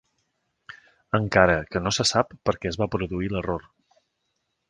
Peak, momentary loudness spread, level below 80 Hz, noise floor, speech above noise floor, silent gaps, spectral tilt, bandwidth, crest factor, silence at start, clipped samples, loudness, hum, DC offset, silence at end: 0 dBFS; 9 LU; -46 dBFS; -76 dBFS; 52 dB; none; -4.5 dB/octave; 10 kHz; 26 dB; 0.7 s; under 0.1%; -24 LUFS; none; under 0.1%; 1.1 s